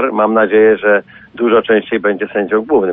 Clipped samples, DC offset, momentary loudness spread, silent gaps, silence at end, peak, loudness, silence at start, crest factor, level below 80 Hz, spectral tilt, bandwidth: under 0.1%; under 0.1%; 6 LU; none; 0 s; -2 dBFS; -13 LUFS; 0 s; 10 dB; -54 dBFS; -10 dB/octave; 3.8 kHz